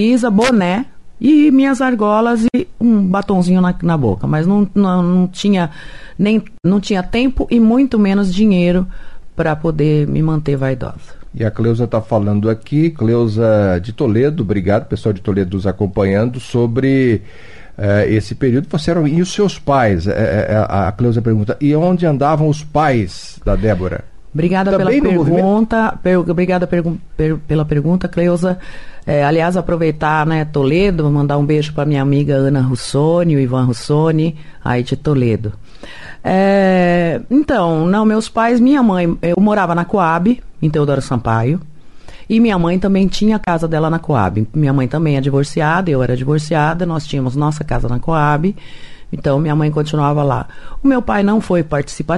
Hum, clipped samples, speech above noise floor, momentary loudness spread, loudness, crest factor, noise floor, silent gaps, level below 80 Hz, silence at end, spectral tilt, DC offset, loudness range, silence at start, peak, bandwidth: none; under 0.1%; 21 dB; 7 LU; -15 LUFS; 12 dB; -35 dBFS; none; -34 dBFS; 0 s; -7.5 dB/octave; 2%; 3 LU; 0 s; -4 dBFS; 11.5 kHz